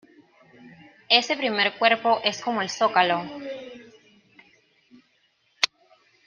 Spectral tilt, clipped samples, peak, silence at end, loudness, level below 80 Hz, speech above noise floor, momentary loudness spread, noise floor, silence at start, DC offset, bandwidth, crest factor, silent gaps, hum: -2.5 dB/octave; under 0.1%; -2 dBFS; 0.6 s; -22 LUFS; -74 dBFS; 44 dB; 16 LU; -67 dBFS; 0.65 s; under 0.1%; 10 kHz; 26 dB; none; none